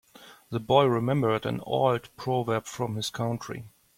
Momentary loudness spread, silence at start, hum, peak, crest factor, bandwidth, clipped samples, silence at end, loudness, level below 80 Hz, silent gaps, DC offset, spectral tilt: 13 LU; 0.2 s; none; -6 dBFS; 20 dB; 16.5 kHz; under 0.1%; 0.3 s; -27 LUFS; -62 dBFS; none; under 0.1%; -6 dB/octave